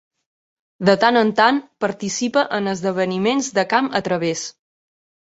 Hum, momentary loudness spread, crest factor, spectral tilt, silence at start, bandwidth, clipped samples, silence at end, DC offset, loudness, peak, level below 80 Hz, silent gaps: none; 9 LU; 18 dB; -4 dB/octave; 0.8 s; 8.2 kHz; under 0.1%; 0.75 s; under 0.1%; -19 LUFS; -2 dBFS; -62 dBFS; none